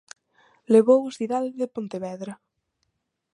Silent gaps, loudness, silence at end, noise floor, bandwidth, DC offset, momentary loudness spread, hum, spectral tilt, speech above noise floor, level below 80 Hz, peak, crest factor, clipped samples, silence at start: none; -23 LUFS; 1 s; -76 dBFS; 11 kHz; under 0.1%; 18 LU; none; -6.5 dB/octave; 54 dB; -78 dBFS; -4 dBFS; 20 dB; under 0.1%; 0.7 s